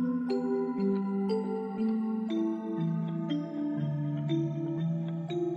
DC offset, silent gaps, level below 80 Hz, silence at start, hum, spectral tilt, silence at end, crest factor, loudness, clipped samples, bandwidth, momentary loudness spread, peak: under 0.1%; none; -76 dBFS; 0 s; none; -9.5 dB/octave; 0 s; 12 dB; -32 LUFS; under 0.1%; 7.6 kHz; 3 LU; -20 dBFS